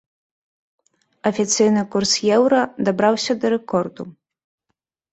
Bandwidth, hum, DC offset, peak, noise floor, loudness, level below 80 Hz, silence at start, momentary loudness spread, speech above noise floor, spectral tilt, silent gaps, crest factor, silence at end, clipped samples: 8.2 kHz; none; under 0.1%; -4 dBFS; -77 dBFS; -19 LUFS; -62 dBFS; 1.25 s; 9 LU; 58 dB; -4 dB/octave; none; 18 dB; 1 s; under 0.1%